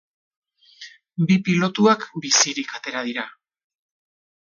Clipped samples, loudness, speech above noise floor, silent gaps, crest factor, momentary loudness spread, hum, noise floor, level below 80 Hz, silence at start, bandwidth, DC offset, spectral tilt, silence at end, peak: under 0.1%; -20 LUFS; 25 dB; none; 20 dB; 16 LU; none; -45 dBFS; -68 dBFS; 0.8 s; 9.4 kHz; under 0.1%; -3.5 dB/octave; 1.15 s; -4 dBFS